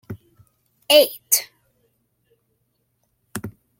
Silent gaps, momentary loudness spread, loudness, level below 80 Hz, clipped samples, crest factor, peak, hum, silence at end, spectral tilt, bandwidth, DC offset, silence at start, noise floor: none; 25 LU; -17 LUFS; -64 dBFS; under 0.1%; 24 dB; 0 dBFS; none; 0.3 s; -1.5 dB/octave; 16.5 kHz; under 0.1%; 0.1 s; -70 dBFS